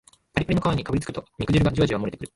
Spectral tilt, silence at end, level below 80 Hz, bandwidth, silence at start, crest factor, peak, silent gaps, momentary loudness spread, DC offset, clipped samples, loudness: -7 dB/octave; 0.1 s; -40 dBFS; 11.5 kHz; 0.35 s; 18 dB; -6 dBFS; none; 9 LU; under 0.1%; under 0.1%; -24 LUFS